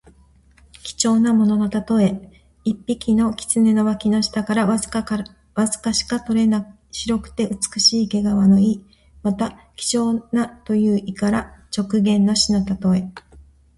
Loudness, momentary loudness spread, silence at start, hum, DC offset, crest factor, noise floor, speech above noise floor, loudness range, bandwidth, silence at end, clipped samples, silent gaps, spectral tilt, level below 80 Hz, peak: -19 LUFS; 11 LU; 0.85 s; none; under 0.1%; 16 dB; -52 dBFS; 34 dB; 3 LU; 11.5 kHz; 0.35 s; under 0.1%; none; -4.5 dB/octave; -46 dBFS; -2 dBFS